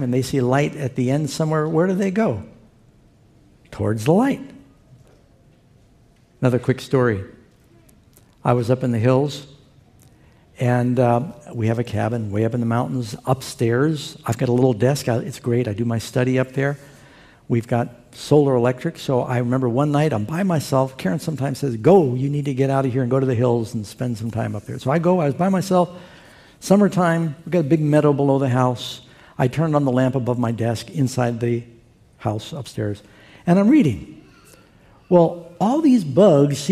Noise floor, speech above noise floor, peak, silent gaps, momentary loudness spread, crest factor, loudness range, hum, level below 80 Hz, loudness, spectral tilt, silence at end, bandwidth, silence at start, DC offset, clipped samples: -54 dBFS; 35 dB; -2 dBFS; none; 11 LU; 20 dB; 5 LU; none; -56 dBFS; -20 LUFS; -7 dB/octave; 0 s; 15 kHz; 0 s; under 0.1%; under 0.1%